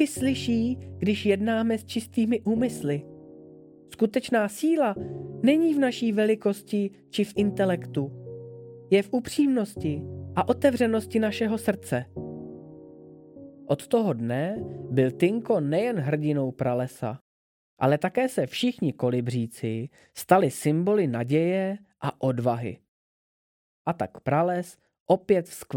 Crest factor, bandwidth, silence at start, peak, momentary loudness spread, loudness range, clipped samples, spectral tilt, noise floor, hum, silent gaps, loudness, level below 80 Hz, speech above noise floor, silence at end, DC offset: 22 dB; 17.5 kHz; 0 s; -4 dBFS; 12 LU; 4 LU; under 0.1%; -6.5 dB/octave; -49 dBFS; none; 17.21-17.77 s, 22.88-23.85 s, 25.00-25.06 s; -26 LUFS; -62 dBFS; 24 dB; 0 s; under 0.1%